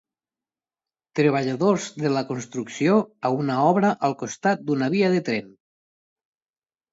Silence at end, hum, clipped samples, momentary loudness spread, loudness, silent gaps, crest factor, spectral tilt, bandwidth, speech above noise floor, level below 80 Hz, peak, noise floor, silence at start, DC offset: 1.45 s; none; under 0.1%; 9 LU; -23 LUFS; none; 18 dB; -6 dB/octave; 8 kHz; over 68 dB; -70 dBFS; -6 dBFS; under -90 dBFS; 1.15 s; under 0.1%